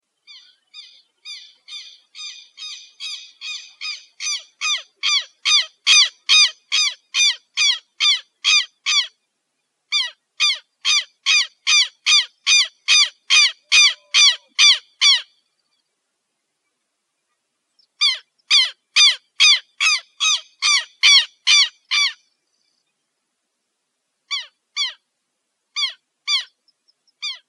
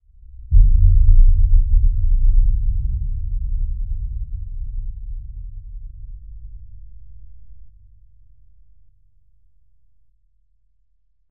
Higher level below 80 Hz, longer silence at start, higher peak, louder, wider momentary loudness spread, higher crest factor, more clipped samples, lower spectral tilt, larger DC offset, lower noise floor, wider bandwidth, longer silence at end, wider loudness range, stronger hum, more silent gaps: second, under -90 dBFS vs -18 dBFS; first, 0.75 s vs 0.35 s; about the same, -2 dBFS vs 0 dBFS; first, -15 LUFS vs -21 LUFS; second, 18 LU vs 24 LU; about the same, 18 dB vs 16 dB; neither; second, 8 dB/octave vs -26.5 dB/octave; neither; first, -75 dBFS vs -67 dBFS; first, 12.5 kHz vs 0.2 kHz; second, 0.1 s vs 3.6 s; second, 15 LU vs 24 LU; neither; neither